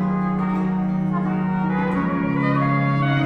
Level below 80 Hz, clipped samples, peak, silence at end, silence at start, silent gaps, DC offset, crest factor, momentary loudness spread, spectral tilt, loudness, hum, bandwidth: -48 dBFS; under 0.1%; -8 dBFS; 0 s; 0 s; none; under 0.1%; 12 dB; 3 LU; -9.5 dB/octave; -21 LUFS; none; 5.2 kHz